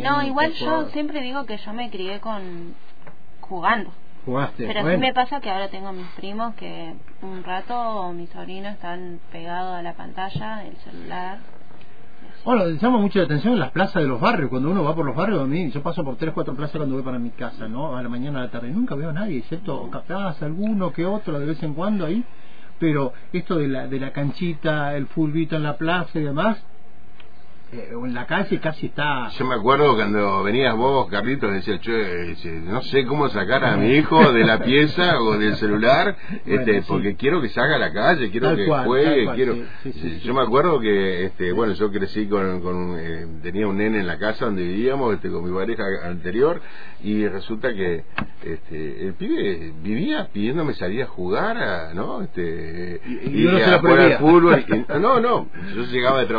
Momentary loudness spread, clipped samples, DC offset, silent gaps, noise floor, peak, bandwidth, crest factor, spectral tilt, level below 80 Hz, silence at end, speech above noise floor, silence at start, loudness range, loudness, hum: 15 LU; under 0.1%; 5%; none; -50 dBFS; -2 dBFS; 5 kHz; 20 dB; -8.5 dB/octave; -52 dBFS; 0 s; 28 dB; 0 s; 11 LU; -21 LUFS; none